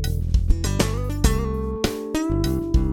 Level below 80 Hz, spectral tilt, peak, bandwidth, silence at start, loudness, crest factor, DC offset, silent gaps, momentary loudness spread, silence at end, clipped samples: -24 dBFS; -5.5 dB/octave; -4 dBFS; 17 kHz; 0 s; -23 LUFS; 18 dB; under 0.1%; none; 4 LU; 0 s; under 0.1%